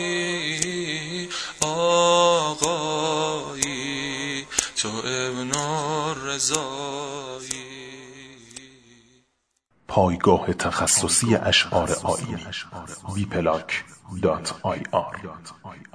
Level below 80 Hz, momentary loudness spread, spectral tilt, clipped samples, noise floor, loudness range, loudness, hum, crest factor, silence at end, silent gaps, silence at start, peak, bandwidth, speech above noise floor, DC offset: -52 dBFS; 19 LU; -3 dB/octave; under 0.1%; -71 dBFS; 8 LU; -23 LUFS; none; 24 dB; 0.1 s; none; 0 s; 0 dBFS; 11 kHz; 47 dB; under 0.1%